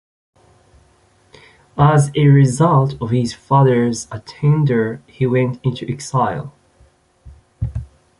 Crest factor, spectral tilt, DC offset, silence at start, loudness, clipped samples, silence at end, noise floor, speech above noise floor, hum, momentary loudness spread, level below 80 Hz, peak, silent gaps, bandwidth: 16 dB; -7 dB/octave; under 0.1%; 1.75 s; -16 LUFS; under 0.1%; 0.35 s; -55 dBFS; 39 dB; none; 15 LU; -42 dBFS; -2 dBFS; none; 11.5 kHz